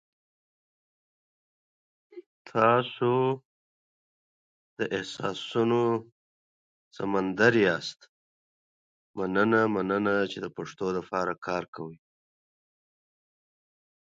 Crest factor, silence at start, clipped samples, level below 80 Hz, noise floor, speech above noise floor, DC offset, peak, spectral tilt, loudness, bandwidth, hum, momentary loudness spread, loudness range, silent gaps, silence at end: 24 dB; 2.15 s; under 0.1%; -68 dBFS; under -90 dBFS; over 63 dB; under 0.1%; -6 dBFS; -6 dB/octave; -27 LUFS; 7.8 kHz; none; 13 LU; 5 LU; 2.26-2.45 s, 3.45-4.76 s, 6.12-6.91 s, 8.09-9.14 s, 11.68-11.73 s; 2.2 s